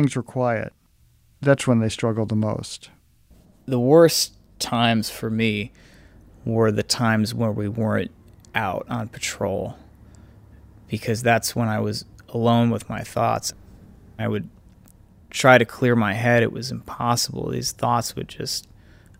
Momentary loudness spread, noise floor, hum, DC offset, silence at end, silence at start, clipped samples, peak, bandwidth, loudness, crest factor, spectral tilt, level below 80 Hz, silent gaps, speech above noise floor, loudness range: 14 LU; -58 dBFS; none; under 0.1%; 0.6 s; 0 s; under 0.1%; 0 dBFS; 16 kHz; -22 LUFS; 22 dB; -5 dB/octave; -52 dBFS; none; 36 dB; 5 LU